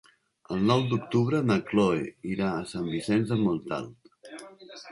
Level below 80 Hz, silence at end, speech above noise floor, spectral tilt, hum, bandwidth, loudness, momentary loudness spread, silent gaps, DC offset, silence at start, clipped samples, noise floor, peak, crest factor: -58 dBFS; 0 s; 20 dB; -7 dB/octave; none; 11.5 kHz; -27 LUFS; 20 LU; none; under 0.1%; 0.5 s; under 0.1%; -47 dBFS; -8 dBFS; 20 dB